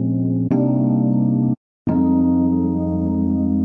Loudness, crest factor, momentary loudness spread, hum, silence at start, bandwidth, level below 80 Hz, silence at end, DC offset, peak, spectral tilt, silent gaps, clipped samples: -18 LUFS; 10 dB; 4 LU; none; 0 s; 2.6 kHz; -48 dBFS; 0 s; under 0.1%; -6 dBFS; -13.5 dB/octave; 1.57-1.85 s; under 0.1%